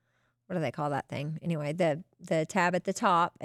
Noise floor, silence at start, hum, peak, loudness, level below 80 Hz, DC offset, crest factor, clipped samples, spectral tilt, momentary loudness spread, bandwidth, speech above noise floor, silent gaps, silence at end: -68 dBFS; 0.5 s; none; -12 dBFS; -30 LUFS; -74 dBFS; under 0.1%; 18 dB; under 0.1%; -5.5 dB/octave; 9 LU; 13.5 kHz; 38 dB; none; 0 s